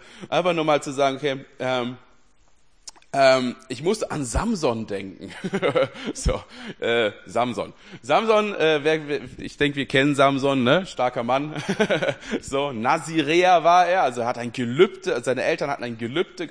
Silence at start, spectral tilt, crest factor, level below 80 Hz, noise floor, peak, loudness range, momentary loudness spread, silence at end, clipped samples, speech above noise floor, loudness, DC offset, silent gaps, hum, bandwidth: 0.15 s; -5 dB/octave; 18 dB; -42 dBFS; -61 dBFS; -4 dBFS; 5 LU; 12 LU; 0 s; under 0.1%; 38 dB; -22 LUFS; 0.2%; none; none; 10.5 kHz